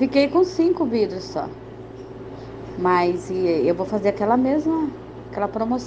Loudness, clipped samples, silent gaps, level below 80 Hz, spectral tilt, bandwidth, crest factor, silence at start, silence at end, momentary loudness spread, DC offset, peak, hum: -21 LUFS; under 0.1%; none; -50 dBFS; -6.5 dB/octave; 8.2 kHz; 16 dB; 0 s; 0 s; 18 LU; under 0.1%; -4 dBFS; none